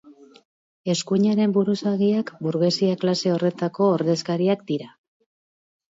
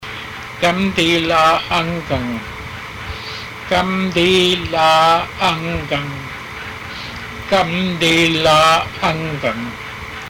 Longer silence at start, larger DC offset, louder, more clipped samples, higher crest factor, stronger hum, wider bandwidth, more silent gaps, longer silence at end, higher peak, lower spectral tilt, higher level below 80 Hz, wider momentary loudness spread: about the same, 0.05 s vs 0 s; neither; second, -22 LUFS vs -15 LUFS; neither; about the same, 14 dB vs 12 dB; neither; second, 8 kHz vs 17 kHz; first, 0.45-0.84 s vs none; first, 1.05 s vs 0 s; about the same, -8 dBFS vs -6 dBFS; first, -6 dB/octave vs -4.5 dB/octave; second, -70 dBFS vs -40 dBFS; second, 6 LU vs 16 LU